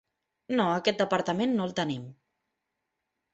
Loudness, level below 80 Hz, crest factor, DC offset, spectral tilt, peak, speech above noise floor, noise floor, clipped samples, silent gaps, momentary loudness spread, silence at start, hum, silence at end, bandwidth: -28 LUFS; -68 dBFS; 20 dB; under 0.1%; -5.5 dB/octave; -10 dBFS; 55 dB; -83 dBFS; under 0.1%; none; 8 LU; 0.5 s; none; 1.2 s; 8.2 kHz